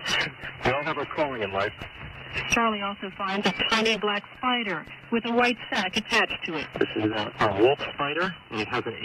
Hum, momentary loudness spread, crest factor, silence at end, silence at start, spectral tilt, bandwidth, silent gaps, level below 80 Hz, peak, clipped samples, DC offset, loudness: none; 9 LU; 16 dB; 0 s; 0 s; -4 dB/octave; 15.5 kHz; none; -54 dBFS; -10 dBFS; under 0.1%; under 0.1%; -26 LUFS